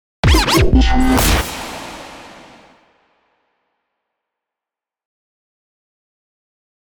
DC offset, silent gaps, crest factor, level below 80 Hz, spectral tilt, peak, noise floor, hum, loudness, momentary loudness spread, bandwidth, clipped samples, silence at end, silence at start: under 0.1%; none; 18 dB; -22 dBFS; -4.5 dB/octave; -2 dBFS; -88 dBFS; none; -14 LUFS; 21 LU; over 20 kHz; under 0.1%; 4.65 s; 0.25 s